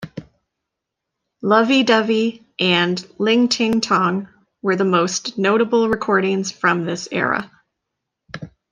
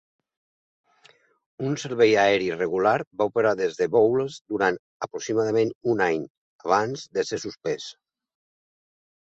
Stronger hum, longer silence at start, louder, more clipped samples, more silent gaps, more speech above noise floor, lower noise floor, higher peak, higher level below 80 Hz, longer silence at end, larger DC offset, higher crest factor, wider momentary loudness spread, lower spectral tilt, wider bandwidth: neither; second, 0 s vs 1.6 s; first, -18 LUFS vs -24 LUFS; neither; second, none vs 3.07-3.11 s, 4.41-4.45 s, 4.79-5.00 s, 5.75-5.81 s, 6.30-6.59 s; first, 63 dB vs 35 dB; first, -81 dBFS vs -59 dBFS; first, -2 dBFS vs -6 dBFS; first, -58 dBFS vs -66 dBFS; second, 0.25 s vs 1.35 s; neither; about the same, 18 dB vs 18 dB; about the same, 12 LU vs 13 LU; about the same, -4.5 dB/octave vs -5 dB/octave; first, 10 kHz vs 8 kHz